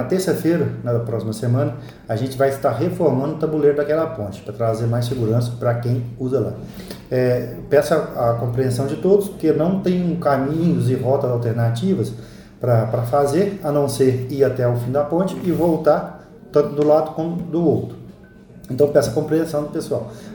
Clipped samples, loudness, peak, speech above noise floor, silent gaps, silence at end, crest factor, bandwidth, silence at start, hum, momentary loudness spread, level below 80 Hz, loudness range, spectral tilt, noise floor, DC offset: under 0.1%; -20 LUFS; -2 dBFS; 24 dB; none; 0 s; 18 dB; over 20 kHz; 0 s; none; 8 LU; -48 dBFS; 2 LU; -7.5 dB/octave; -43 dBFS; under 0.1%